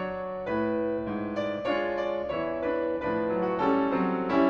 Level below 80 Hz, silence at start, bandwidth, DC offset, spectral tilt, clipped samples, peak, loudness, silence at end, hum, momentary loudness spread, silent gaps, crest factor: -56 dBFS; 0 s; 6.8 kHz; under 0.1%; -8 dB/octave; under 0.1%; -12 dBFS; -29 LUFS; 0 s; none; 6 LU; none; 16 dB